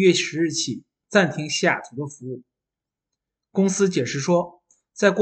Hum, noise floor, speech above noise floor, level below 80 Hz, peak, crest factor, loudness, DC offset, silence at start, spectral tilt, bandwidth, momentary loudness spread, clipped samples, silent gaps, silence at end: none; -87 dBFS; 66 dB; -68 dBFS; -4 dBFS; 20 dB; -22 LUFS; under 0.1%; 0 s; -4.5 dB/octave; 9 kHz; 15 LU; under 0.1%; none; 0 s